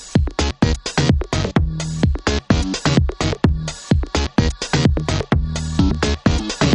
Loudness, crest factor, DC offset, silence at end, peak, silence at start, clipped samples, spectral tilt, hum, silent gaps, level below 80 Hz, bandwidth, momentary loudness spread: -19 LUFS; 16 dB; under 0.1%; 0 s; -2 dBFS; 0 s; under 0.1%; -5.5 dB/octave; none; none; -24 dBFS; 11 kHz; 3 LU